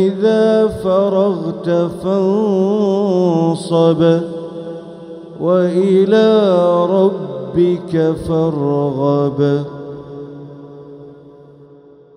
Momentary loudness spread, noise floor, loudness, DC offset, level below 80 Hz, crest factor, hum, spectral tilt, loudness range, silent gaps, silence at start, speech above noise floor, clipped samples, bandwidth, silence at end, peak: 19 LU; -43 dBFS; -14 LUFS; under 0.1%; -48 dBFS; 14 dB; none; -8 dB/octave; 5 LU; none; 0 s; 29 dB; under 0.1%; 11 kHz; 0.85 s; 0 dBFS